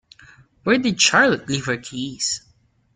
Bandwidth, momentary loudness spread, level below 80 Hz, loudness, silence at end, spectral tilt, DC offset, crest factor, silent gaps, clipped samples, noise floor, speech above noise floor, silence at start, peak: 9.6 kHz; 15 LU; -58 dBFS; -19 LUFS; 0.55 s; -2.5 dB/octave; under 0.1%; 20 dB; none; under 0.1%; -50 dBFS; 30 dB; 0.65 s; -2 dBFS